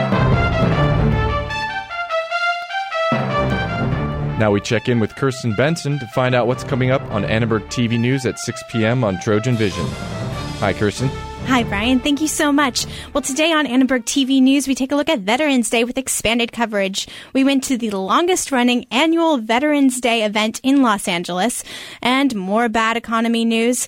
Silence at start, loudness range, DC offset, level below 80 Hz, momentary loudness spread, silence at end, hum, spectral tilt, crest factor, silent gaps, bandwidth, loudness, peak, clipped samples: 0 s; 3 LU; under 0.1%; -36 dBFS; 7 LU; 0 s; none; -4.5 dB/octave; 14 dB; none; 16.5 kHz; -18 LUFS; -4 dBFS; under 0.1%